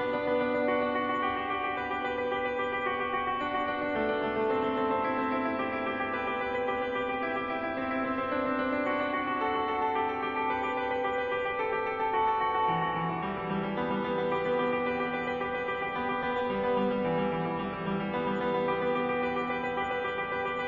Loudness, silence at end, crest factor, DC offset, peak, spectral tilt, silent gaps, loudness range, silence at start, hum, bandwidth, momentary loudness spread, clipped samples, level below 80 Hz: -30 LUFS; 0 s; 14 dB; under 0.1%; -16 dBFS; -3.5 dB/octave; none; 1 LU; 0 s; none; 7.2 kHz; 3 LU; under 0.1%; -60 dBFS